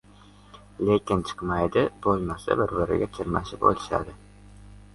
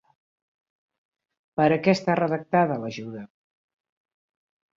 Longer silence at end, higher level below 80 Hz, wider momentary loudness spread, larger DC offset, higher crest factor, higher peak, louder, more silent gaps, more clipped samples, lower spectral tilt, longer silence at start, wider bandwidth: second, 0.15 s vs 1.5 s; first, -46 dBFS vs -68 dBFS; second, 6 LU vs 15 LU; neither; about the same, 22 dB vs 20 dB; about the same, -6 dBFS vs -6 dBFS; second, -26 LUFS vs -23 LUFS; neither; neither; about the same, -7 dB/octave vs -7 dB/octave; second, 0.55 s vs 1.55 s; first, 11.5 kHz vs 7.6 kHz